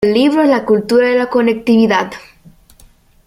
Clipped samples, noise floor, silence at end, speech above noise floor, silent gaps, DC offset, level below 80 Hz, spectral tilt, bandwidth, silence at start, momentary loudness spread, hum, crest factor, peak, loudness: under 0.1%; -46 dBFS; 1.05 s; 34 dB; none; under 0.1%; -50 dBFS; -6 dB/octave; 15 kHz; 0 s; 5 LU; none; 12 dB; 0 dBFS; -12 LUFS